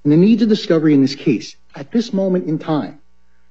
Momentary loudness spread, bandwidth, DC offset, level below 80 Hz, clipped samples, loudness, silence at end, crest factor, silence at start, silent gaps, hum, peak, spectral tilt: 12 LU; 7.8 kHz; 0.7%; -62 dBFS; under 0.1%; -16 LUFS; 0.6 s; 14 dB; 0.05 s; none; none; -2 dBFS; -7.5 dB/octave